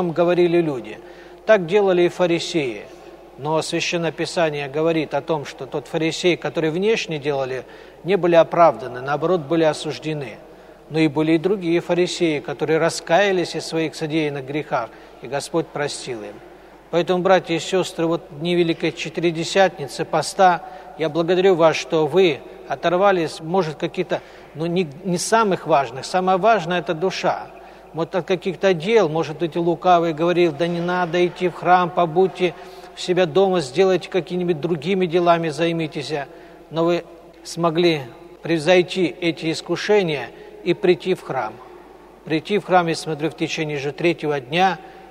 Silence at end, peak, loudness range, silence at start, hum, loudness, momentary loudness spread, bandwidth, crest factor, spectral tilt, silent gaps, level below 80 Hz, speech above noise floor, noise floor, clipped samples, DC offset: 0 s; -2 dBFS; 4 LU; 0 s; none; -20 LUFS; 12 LU; 13.5 kHz; 18 dB; -5.5 dB/octave; none; -58 dBFS; 24 dB; -44 dBFS; under 0.1%; under 0.1%